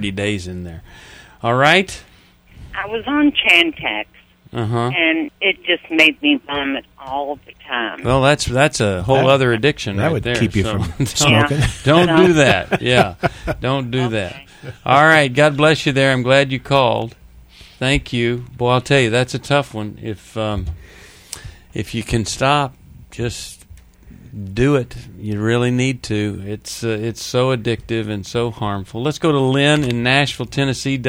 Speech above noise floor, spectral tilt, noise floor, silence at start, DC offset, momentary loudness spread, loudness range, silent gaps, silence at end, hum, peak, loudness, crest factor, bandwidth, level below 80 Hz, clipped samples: 30 dB; -5 dB/octave; -47 dBFS; 0 s; under 0.1%; 16 LU; 7 LU; none; 0 s; none; 0 dBFS; -16 LUFS; 18 dB; over 20 kHz; -38 dBFS; under 0.1%